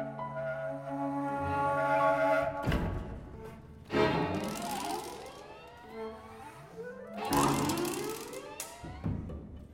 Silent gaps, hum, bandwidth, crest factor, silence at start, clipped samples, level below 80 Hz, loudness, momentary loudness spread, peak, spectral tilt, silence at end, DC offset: none; none; 17 kHz; 20 dB; 0 s; under 0.1%; -50 dBFS; -33 LUFS; 19 LU; -14 dBFS; -5 dB/octave; 0 s; under 0.1%